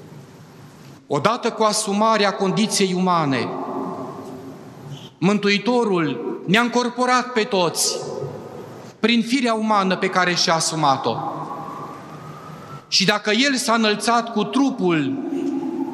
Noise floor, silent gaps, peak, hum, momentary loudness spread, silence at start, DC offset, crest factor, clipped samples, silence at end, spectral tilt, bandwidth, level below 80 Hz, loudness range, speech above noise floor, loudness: -43 dBFS; none; 0 dBFS; none; 19 LU; 0 s; under 0.1%; 20 dB; under 0.1%; 0 s; -4 dB/octave; 13 kHz; -70 dBFS; 3 LU; 24 dB; -19 LUFS